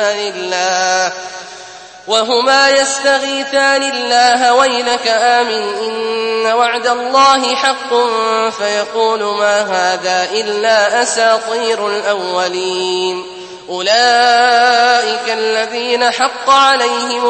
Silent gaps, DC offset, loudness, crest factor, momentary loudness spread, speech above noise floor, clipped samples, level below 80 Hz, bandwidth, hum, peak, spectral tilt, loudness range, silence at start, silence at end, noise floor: none; under 0.1%; -12 LUFS; 14 dB; 9 LU; 21 dB; under 0.1%; -60 dBFS; 8.8 kHz; none; 0 dBFS; -1 dB/octave; 3 LU; 0 s; 0 s; -34 dBFS